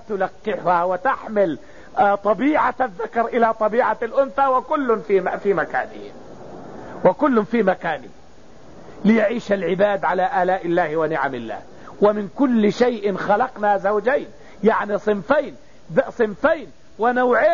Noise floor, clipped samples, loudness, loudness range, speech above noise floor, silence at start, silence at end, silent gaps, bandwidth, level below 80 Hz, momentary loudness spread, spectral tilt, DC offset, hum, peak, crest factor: -47 dBFS; under 0.1%; -20 LUFS; 2 LU; 27 dB; 0.1 s; 0 s; none; 7.2 kHz; -54 dBFS; 11 LU; -5 dB/octave; 0.8%; none; -4 dBFS; 16 dB